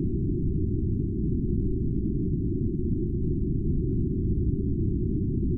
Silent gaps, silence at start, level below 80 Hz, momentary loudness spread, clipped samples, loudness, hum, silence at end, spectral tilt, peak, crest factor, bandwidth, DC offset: none; 0 s; -32 dBFS; 1 LU; under 0.1%; -28 LUFS; none; 0 s; -16 dB/octave; -16 dBFS; 10 dB; 0.5 kHz; under 0.1%